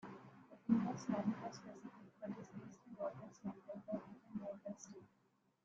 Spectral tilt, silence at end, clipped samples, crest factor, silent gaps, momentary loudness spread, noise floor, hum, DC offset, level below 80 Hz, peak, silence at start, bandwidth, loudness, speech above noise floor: -7 dB/octave; 0.6 s; under 0.1%; 24 dB; none; 19 LU; -79 dBFS; none; under 0.1%; -82 dBFS; -22 dBFS; 0 s; 7.6 kHz; -46 LUFS; 35 dB